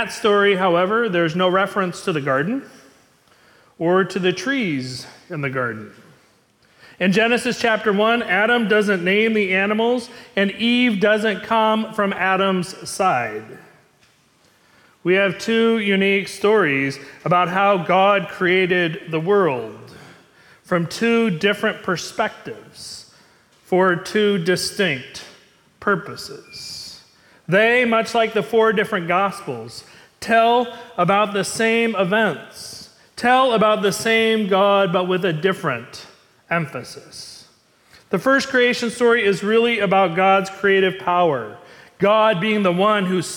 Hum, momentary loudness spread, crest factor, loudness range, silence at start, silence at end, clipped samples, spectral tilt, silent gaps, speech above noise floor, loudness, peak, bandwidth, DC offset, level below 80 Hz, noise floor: none; 16 LU; 14 dB; 5 LU; 0 s; 0 s; under 0.1%; -5 dB/octave; none; 39 dB; -18 LUFS; -6 dBFS; 18 kHz; under 0.1%; -64 dBFS; -57 dBFS